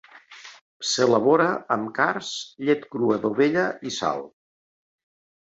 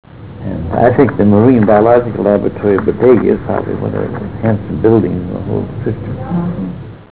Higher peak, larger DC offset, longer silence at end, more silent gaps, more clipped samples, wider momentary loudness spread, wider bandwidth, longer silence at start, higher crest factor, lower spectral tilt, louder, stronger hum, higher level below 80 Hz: second, -6 dBFS vs 0 dBFS; second, under 0.1% vs 0.9%; first, 1.35 s vs 0.05 s; first, 0.61-0.80 s vs none; neither; about the same, 13 LU vs 13 LU; first, 8.2 kHz vs 4 kHz; about the same, 0.15 s vs 0.1 s; first, 18 dB vs 12 dB; second, -4 dB/octave vs -13 dB/octave; second, -23 LUFS vs -13 LUFS; neither; second, -68 dBFS vs -34 dBFS